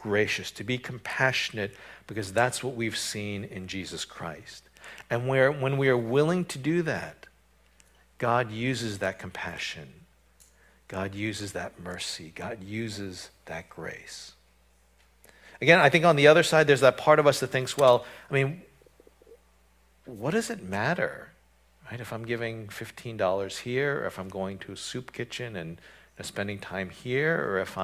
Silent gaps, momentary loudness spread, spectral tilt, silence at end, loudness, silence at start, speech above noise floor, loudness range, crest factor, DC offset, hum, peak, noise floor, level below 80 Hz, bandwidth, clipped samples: none; 19 LU; -4.5 dB/octave; 0 s; -27 LUFS; 0 s; 36 dB; 14 LU; 26 dB; under 0.1%; none; -4 dBFS; -63 dBFS; -60 dBFS; 16 kHz; under 0.1%